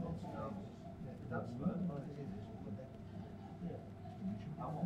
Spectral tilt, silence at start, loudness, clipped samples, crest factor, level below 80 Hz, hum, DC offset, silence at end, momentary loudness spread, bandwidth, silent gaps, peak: -9 dB/octave; 0 s; -46 LUFS; under 0.1%; 18 dB; -62 dBFS; none; under 0.1%; 0 s; 10 LU; 9.2 kHz; none; -28 dBFS